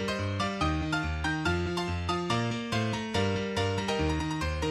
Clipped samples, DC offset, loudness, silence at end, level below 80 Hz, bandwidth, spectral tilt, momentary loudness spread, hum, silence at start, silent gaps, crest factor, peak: under 0.1%; under 0.1%; -30 LUFS; 0 s; -42 dBFS; 13 kHz; -5.5 dB/octave; 2 LU; none; 0 s; none; 16 dB; -14 dBFS